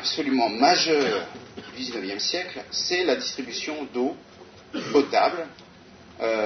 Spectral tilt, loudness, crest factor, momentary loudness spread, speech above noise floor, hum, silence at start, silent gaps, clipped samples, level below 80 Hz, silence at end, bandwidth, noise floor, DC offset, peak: -2.5 dB/octave; -24 LUFS; 22 dB; 16 LU; 24 dB; none; 0 s; none; under 0.1%; -66 dBFS; 0 s; 6.6 kHz; -48 dBFS; under 0.1%; -4 dBFS